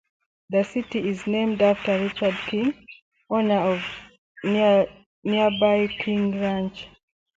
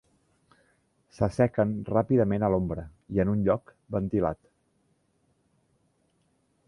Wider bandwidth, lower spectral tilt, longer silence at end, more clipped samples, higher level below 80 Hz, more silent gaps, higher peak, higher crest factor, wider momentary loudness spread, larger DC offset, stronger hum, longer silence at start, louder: second, 7.8 kHz vs 11 kHz; second, -7 dB/octave vs -9.5 dB/octave; second, 0.5 s vs 2.35 s; neither; second, -58 dBFS vs -50 dBFS; first, 3.02-3.12 s, 4.18-4.35 s, 5.06-5.22 s vs none; about the same, -6 dBFS vs -8 dBFS; about the same, 16 dB vs 20 dB; first, 13 LU vs 9 LU; neither; neither; second, 0.5 s vs 1.2 s; first, -23 LUFS vs -27 LUFS